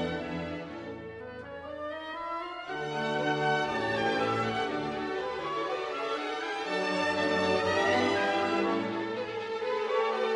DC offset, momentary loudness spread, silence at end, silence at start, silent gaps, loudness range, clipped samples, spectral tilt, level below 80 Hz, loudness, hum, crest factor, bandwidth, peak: under 0.1%; 12 LU; 0 s; 0 s; none; 5 LU; under 0.1%; -5 dB/octave; -60 dBFS; -31 LUFS; none; 18 dB; 11.5 kHz; -14 dBFS